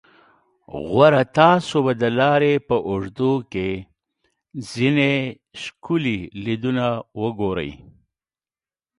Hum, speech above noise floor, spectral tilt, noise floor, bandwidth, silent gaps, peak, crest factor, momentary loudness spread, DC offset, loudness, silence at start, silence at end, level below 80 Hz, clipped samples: none; over 70 dB; -6.5 dB/octave; under -90 dBFS; 11.5 kHz; none; 0 dBFS; 20 dB; 18 LU; under 0.1%; -20 LUFS; 0.75 s; 1.25 s; -52 dBFS; under 0.1%